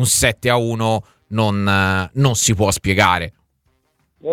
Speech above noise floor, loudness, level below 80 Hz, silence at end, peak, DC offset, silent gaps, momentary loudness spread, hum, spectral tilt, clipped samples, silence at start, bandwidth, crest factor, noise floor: 48 dB; -17 LUFS; -40 dBFS; 0 s; 0 dBFS; under 0.1%; none; 9 LU; none; -4 dB/octave; under 0.1%; 0 s; 18 kHz; 18 dB; -64 dBFS